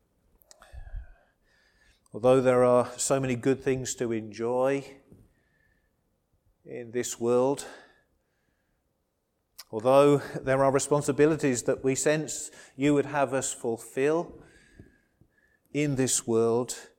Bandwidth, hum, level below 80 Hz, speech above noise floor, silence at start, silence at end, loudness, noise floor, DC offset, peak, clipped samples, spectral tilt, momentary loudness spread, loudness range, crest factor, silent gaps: 17 kHz; none; -56 dBFS; 51 dB; 0.75 s; 0.15 s; -26 LUFS; -77 dBFS; under 0.1%; -8 dBFS; under 0.1%; -5 dB/octave; 15 LU; 8 LU; 20 dB; none